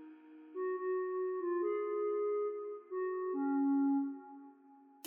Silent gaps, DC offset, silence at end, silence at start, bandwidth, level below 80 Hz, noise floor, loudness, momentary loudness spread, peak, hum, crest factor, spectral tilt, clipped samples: none; under 0.1%; 0.3 s; 0 s; 3.1 kHz; under -90 dBFS; -61 dBFS; -36 LUFS; 17 LU; -28 dBFS; none; 10 dB; 0 dB/octave; under 0.1%